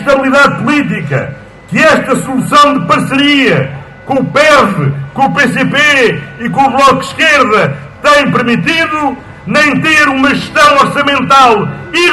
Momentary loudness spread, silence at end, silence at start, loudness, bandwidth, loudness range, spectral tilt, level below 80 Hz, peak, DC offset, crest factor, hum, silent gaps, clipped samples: 9 LU; 0 s; 0 s; -8 LUFS; 12.5 kHz; 1 LU; -4.5 dB/octave; -42 dBFS; 0 dBFS; under 0.1%; 8 dB; none; none; 1%